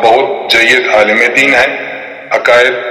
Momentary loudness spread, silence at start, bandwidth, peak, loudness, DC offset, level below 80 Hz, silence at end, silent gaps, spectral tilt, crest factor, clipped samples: 11 LU; 0 s; 16.5 kHz; 0 dBFS; -8 LUFS; under 0.1%; -48 dBFS; 0 s; none; -2.5 dB/octave; 10 dB; 0.7%